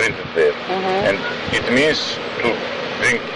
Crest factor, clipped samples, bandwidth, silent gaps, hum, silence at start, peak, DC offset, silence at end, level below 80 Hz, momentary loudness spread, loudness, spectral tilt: 14 dB; under 0.1%; 11.5 kHz; none; none; 0 s; -6 dBFS; under 0.1%; 0 s; -48 dBFS; 6 LU; -19 LUFS; -3.5 dB/octave